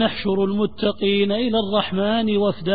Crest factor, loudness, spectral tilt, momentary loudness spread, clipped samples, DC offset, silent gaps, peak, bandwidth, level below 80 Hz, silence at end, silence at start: 16 dB; -20 LUFS; -11 dB/octave; 2 LU; under 0.1%; 1%; none; -4 dBFS; 4.9 kHz; -48 dBFS; 0 s; 0 s